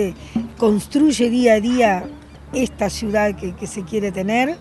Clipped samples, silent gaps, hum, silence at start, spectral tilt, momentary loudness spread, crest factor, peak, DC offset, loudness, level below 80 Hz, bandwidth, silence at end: under 0.1%; none; none; 0 s; -5 dB/octave; 12 LU; 16 dB; -2 dBFS; under 0.1%; -19 LUFS; -42 dBFS; 12 kHz; 0 s